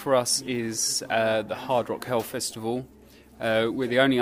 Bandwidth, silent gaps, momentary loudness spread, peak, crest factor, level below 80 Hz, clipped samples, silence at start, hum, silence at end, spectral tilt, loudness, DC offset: 16 kHz; none; 8 LU; -6 dBFS; 20 dB; -60 dBFS; under 0.1%; 0 s; none; 0 s; -3 dB/octave; -26 LUFS; under 0.1%